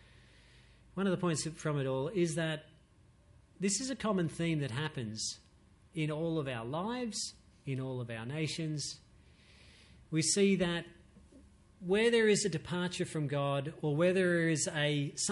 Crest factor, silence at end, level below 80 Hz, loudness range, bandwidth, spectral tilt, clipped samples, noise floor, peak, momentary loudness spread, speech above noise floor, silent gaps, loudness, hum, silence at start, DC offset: 16 dB; 0 s; -64 dBFS; 7 LU; 11.5 kHz; -4.5 dB/octave; under 0.1%; -64 dBFS; -18 dBFS; 11 LU; 31 dB; none; -34 LUFS; none; 0.95 s; under 0.1%